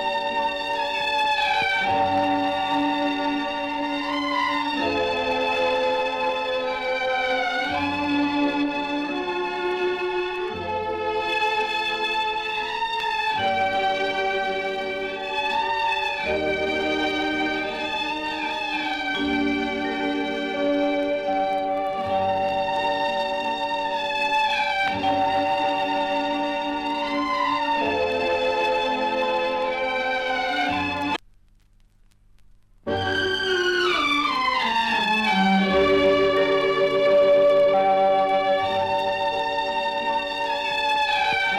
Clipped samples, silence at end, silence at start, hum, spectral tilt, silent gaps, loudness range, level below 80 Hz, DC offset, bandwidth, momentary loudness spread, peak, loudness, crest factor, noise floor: under 0.1%; 0 s; 0 s; none; -4.5 dB/octave; none; 5 LU; -52 dBFS; under 0.1%; 14 kHz; 6 LU; -8 dBFS; -23 LUFS; 14 dB; -56 dBFS